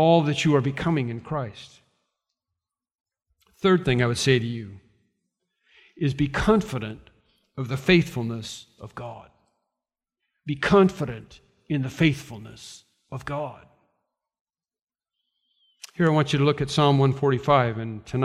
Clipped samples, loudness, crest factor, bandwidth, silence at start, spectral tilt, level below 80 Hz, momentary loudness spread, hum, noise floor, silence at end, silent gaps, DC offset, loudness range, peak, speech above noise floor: under 0.1%; -23 LUFS; 22 dB; 13.5 kHz; 0 s; -6 dB/octave; -50 dBFS; 20 LU; none; under -90 dBFS; 0 s; 14.41-14.45 s, 14.81-14.87 s; under 0.1%; 6 LU; -4 dBFS; over 67 dB